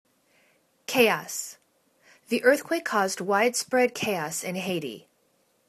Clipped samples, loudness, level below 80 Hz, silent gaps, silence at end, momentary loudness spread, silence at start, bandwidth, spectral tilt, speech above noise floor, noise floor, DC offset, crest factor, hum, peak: under 0.1%; -25 LUFS; -74 dBFS; none; 0.7 s; 12 LU; 0.9 s; 14 kHz; -3 dB/octave; 43 dB; -68 dBFS; under 0.1%; 24 dB; none; -4 dBFS